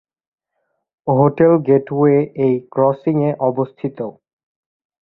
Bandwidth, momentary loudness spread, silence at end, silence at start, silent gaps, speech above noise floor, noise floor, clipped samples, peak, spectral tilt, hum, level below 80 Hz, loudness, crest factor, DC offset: 4.1 kHz; 13 LU; 0.9 s; 1.05 s; none; 57 dB; -72 dBFS; under 0.1%; 0 dBFS; -13 dB/octave; none; -58 dBFS; -16 LUFS; 18 dB; under 0.1%